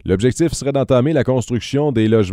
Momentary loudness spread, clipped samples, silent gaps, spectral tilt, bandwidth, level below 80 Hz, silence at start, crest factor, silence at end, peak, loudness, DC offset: 4 LU; under 0.1%; none; -6.5 dB/octave; 13.5 kHz; -40 dBFS; 0.05 s; 14 dB; 0 s; -2 dBFS; -17 LUFS; under 0.1%